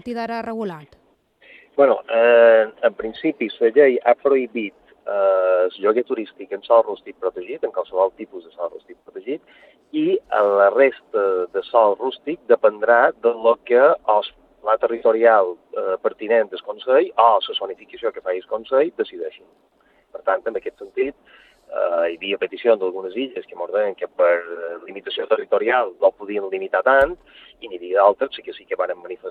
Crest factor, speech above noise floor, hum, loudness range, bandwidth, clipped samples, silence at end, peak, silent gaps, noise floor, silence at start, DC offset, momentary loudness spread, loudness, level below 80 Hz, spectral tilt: 18 dB; 36 dB; none; 8 LU; 5.2 kHz; under 0.1%; 0 s; -2 dBFS; none; -55 dBFS; 0.05 s; under 0.1%; 16 LU; -19 LUFS; -60 dBFS; -6.5 dB/octave